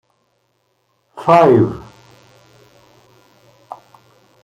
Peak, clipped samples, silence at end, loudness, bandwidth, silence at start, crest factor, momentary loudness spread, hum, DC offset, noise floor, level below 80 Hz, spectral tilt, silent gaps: 0 dBFS; under 0.1%; 2.65 s; -13 LUFS; 11 kHz; 1.15 s; 18 dB; 28 LU; none; under 0.1%; -65 dBFS; -54 dBFS; -8 dB/octave; none